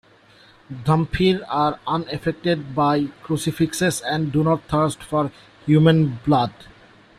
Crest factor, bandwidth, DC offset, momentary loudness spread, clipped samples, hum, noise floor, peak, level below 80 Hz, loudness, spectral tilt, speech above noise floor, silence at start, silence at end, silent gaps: 18 dB; 14.5 kHz; under 0.1%; 9 LU; under 0.1%; none; -51 dBFS; -4 dBFS; -46 dBFS; -21 LUFS; -6 dB/octave; 31 dB; 0.7 s; 0.55 s; none